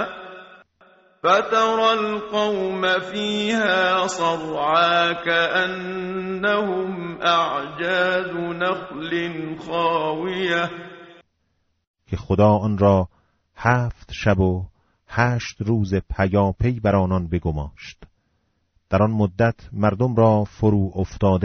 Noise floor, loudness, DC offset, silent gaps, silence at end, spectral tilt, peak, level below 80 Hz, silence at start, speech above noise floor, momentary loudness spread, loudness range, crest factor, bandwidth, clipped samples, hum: -69 dBFS; -21 LUFS; under 0.1%; 11.87-11.94 s; 0 s; -4.5 dB/octave; -4 dBFS; -42 dBFS; 0 s; 49 dB; 11 LU; 4 LU; 18 dB; 8 kHz; under 0.1%; none